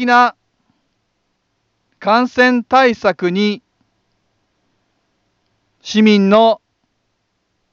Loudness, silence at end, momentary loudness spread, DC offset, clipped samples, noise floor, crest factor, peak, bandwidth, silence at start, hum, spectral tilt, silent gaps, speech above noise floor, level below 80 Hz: -13 LUFS; 1.15 s; 12 LU; under 0.1%; under 0.1%; -68 dBFS; 16 dB; 0 dBFS; 7.2 kHz; 0 s; none; -5.5 dB/octave; none; 56 dB; -62 dBFS